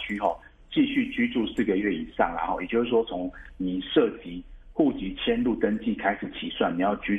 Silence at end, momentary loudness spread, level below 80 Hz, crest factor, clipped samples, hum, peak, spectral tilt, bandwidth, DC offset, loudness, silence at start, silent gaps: 0 s; 9 LU; -48 dBFS; 18 dB; under 0.1%; none; -8 dBFS; -7.5 dB/octave; 8 kHz; under 0.1%; -27 LUFS; 0 s; none